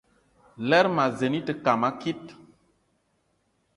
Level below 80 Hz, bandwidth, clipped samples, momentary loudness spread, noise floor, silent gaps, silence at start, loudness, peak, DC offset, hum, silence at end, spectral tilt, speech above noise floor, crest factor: -66 dBFS; 11.5 kHz; under 0.1%; 13 LU; -71 dBFS; none; 0.6 s; -25 LUFS; -6 dBFS; under 0.1%; none; 1.45 s; -6 dB/octave; 47 dB; 22 dB